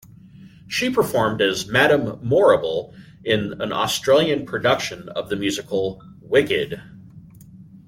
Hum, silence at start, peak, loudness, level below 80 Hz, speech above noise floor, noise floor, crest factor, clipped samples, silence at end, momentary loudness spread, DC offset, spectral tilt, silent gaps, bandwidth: none; 0.4 s; -2 dBFS; -20 LUFS; -54 dBFS; 24 dB; -45 dBFS; 18 dB; under 0.1%; 0.25 s; 12 LU; under 0.1%; -4.5 dB/octave; none; 16.5 kHz